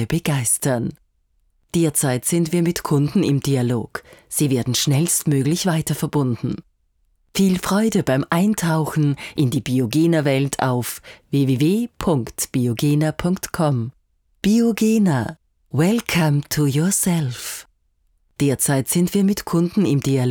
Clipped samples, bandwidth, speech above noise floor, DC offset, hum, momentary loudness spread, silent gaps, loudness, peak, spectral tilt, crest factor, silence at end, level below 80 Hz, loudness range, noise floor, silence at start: under 0.1%; 19.5 kHz; 45 dB; under 0.1%; none; 8 LU; none; -20 LUFS; -4 dBFS; -5.5 dB/octave; 16 dB; 0 s; -50 dBFS; 2 LU; -64 dBFS; 0 s